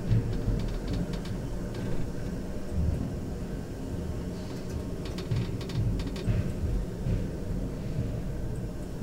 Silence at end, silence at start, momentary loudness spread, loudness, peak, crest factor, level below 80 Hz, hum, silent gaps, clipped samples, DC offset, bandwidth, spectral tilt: 0 s; 0 s; 6 LU; -33 LUFS; -14 dBFS; 18 dB; -36 dBFS; none; none; under 0.1%; under 0.1%; 16 kHz; -7.5 dB/octave